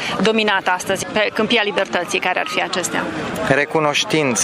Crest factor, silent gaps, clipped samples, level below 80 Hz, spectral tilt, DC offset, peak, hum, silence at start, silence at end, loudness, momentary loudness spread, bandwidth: 18 dB; none; under 0.1%; -52 dBFS; -3 dB/octave; under 0.1%; 0 dBFS; none; 0 s; 0 s; -18 LUFS; 4 LU; 15.5 kHz